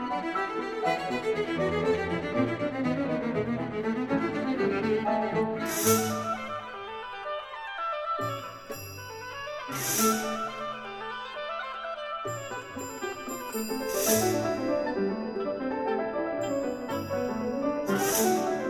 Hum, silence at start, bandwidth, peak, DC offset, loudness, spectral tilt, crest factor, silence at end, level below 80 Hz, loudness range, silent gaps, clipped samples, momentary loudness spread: none; 0 s; 19.5 kHz; -10 dBFS; under 0.1%; -30 LUFS; -4 dB/octave; 20 dB; 0 s; -60 dBFS; 6 LU; none; under 0.1%; 12 LU